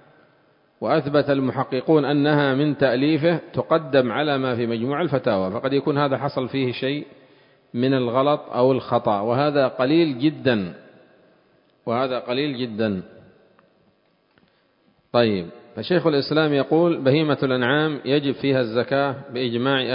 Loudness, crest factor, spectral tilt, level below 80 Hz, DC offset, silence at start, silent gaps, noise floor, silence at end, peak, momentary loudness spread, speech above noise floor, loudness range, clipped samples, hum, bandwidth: -21 LUFS; 18 dB; -11.5 dB/octave; -60 dBFS; under 0.1%; 0.8 s; none; -62 dBFS; 0 s; -2 dBFS; 7 LU; 42 dB; 8 LU; under 0.1%; none; 5.4 kHz